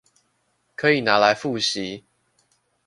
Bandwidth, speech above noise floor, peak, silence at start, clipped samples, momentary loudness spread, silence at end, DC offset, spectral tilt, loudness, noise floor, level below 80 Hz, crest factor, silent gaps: 11.5 kHz; 49 dB; -2 dBFS; 0.8 s; under 0.1%; 19 LU; 0.85 s; under 0.1%; -3.5 dB/octave; -20 LUFS; -69 dBFS; -64 dBFS; 22 dB; none